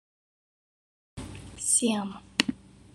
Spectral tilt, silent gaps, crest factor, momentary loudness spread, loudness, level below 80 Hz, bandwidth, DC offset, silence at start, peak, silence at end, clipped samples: -2 dB/octave; none; 30 dB; 20 LU; -27 LUFS; -56 dBFS; 13 kHz; under 0.1%; 1.15 s; -2 dBFS; 0.4 s; under 0.1%